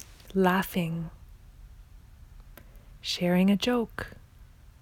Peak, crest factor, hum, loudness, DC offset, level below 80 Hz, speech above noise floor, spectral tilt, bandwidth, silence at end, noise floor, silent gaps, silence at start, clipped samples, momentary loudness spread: -10 dBFS; 20 dB; none; -28 LUFS; under 0.1%; -50 dBFS; 26 dB; -6 dB/octave; 18.5 kHz; 0.35 s; -52 dBFS; none; 0 s; under 0.1%; 16 LU